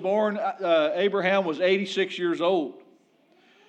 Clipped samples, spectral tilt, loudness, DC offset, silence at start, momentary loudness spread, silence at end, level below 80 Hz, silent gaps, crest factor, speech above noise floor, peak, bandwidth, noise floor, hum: under 0.1%; -5.5 dB/octave; -24 LUFS; under 0.1%; 0 s; 5 LU; 0.9 s; under -90 dBFS; none; 16 dB; 37 dB; -10 dBFS; 8.8 kHz; -61 dBFS; none